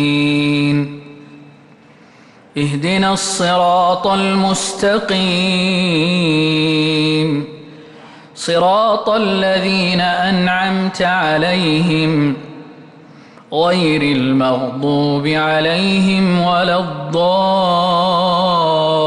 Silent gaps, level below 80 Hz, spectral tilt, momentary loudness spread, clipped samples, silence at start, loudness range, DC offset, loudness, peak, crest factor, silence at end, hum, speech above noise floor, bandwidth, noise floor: none; -50 dBFS; -5 dB/octave; 5 LU; under 0.1%; 0 s; 3 LU; under 0.1%; -14 LUFS; -4 dBFS; 10 dB; 0 s; none; 30 dB; 12 kHz; -44 dBFS